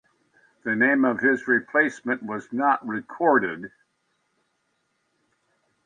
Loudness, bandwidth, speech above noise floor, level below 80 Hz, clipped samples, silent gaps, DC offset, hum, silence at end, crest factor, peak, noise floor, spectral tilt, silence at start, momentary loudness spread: -23 LUFS; 9.4 kHz; 50 dB; -74 dBFS; under 0.1%; none; under 0.1%; none; 2.15 s; 18 dB; -6 dBFS; -73 dBFS; -6.5 dB/octave; 0.65 s; 12 LU